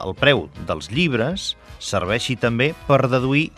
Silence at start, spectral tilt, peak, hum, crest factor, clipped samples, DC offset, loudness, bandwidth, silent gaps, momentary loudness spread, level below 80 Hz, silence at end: 0 s; -5 dB/octave; 0 dBFS; none; 20 dB; under 0.1%; under 0.1%; -20 LUFS; 13 kHz; none; 10 LU; -44 dBFS; 0.1 s